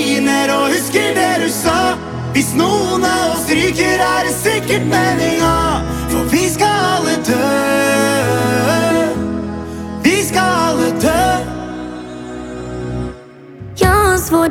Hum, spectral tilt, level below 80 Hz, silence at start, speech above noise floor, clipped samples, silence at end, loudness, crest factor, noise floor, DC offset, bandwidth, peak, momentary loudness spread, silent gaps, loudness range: none; -4 dB/octave; -32 dBFS; 0 s; 22 dB; under 0.1%; 0 s; -14 LUFS; 14 dB; -35 dBFS; under 0.1%; 18 kHz; 0 dBFS; 12 LU; none; 4 LU